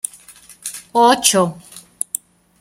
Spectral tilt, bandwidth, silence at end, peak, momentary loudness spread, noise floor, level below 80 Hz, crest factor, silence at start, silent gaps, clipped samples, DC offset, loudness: -2.5 dB/octave; 16.5 kHz; 0.8 s; 0 dBFS; 18 LU; -44 dBFS; -62 dBFS; 20 dB; 0.3 s; none; under 0.1%; under 0.1%; -16 LUFS